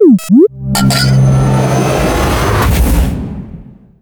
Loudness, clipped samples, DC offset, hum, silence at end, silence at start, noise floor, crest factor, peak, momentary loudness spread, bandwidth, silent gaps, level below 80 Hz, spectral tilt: -11 LUFS; under 0.1%; under 0.1%; none; 0.4 s; 0 s; -32 dBFS; 10 dB; 0 dBFS; 11 LU; 20 kHz; none; -18 dBFS; -6 dB/octave